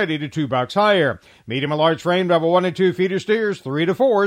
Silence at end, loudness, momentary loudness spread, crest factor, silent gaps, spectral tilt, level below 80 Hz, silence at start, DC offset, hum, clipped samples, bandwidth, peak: 0 s; -19 LUFS; 6 LU; 14 dB; none; -6.5 dB/octave; -62 dBFS; 0 s; under 0.1%; none; under 0.1%; 14 kHz; -4 dBFS